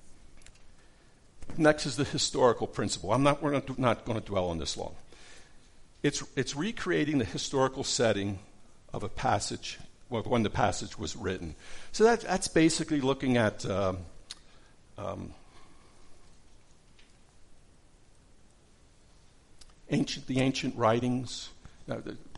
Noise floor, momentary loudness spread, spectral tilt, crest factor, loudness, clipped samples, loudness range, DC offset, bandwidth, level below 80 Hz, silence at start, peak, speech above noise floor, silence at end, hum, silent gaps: -59 dBFS; 16 LU; -4.5 dB/octave; 22 dB; -30 LUFS; under 0.1%; 11 LU; under 0.1%; 11.5 kHz; -52 dBFS; 0.05 s; -10 dBFS; 30 dB; 0 s; none; none